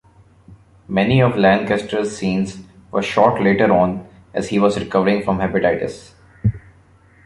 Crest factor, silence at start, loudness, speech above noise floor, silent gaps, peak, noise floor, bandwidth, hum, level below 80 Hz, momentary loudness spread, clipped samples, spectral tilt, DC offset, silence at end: 16 dB; 0.5 s; -18 LUFS; 33 dB; none; -2 dBFS; -50 dBFS; 11.5 kHz; none; -44 dBFS; 12 LU; under 0.1%; -6.5 dB/octave; under 0.1%; 0.7 s